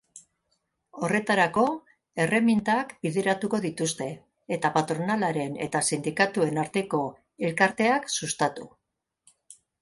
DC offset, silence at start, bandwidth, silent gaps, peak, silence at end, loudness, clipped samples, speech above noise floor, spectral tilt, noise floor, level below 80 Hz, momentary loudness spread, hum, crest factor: under 0.1%; 0.15 s; 11.5 kHz; none; -8 dBFS; 0.3 s; -26 LUFS; under 0.1%; 50 dB; -4.5 dB/octave; -76 dBFS; -66 dBFS; 11 LU; none; 20 dB